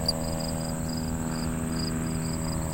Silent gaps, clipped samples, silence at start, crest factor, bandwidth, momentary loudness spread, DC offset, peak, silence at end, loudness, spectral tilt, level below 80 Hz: none; under 0.1%; 0 s; 16 dB; 16 kHz; 1 LU; under 0.1%; -14 dBFS; 0 s; -30 LUFS; -4.5 dB/octave; -38 dBFS